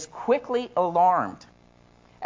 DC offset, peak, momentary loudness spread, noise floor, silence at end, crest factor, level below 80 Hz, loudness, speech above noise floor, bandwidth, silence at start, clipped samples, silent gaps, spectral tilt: under 0.1%; -10 dBFS; 6 LU; -56 dBFS; 0 s; 16 dB; -64 dBFS; -24 LUFS; 33 dB; 7.6 kHz; 0 s; under 0.1%; none; -5 dB/octave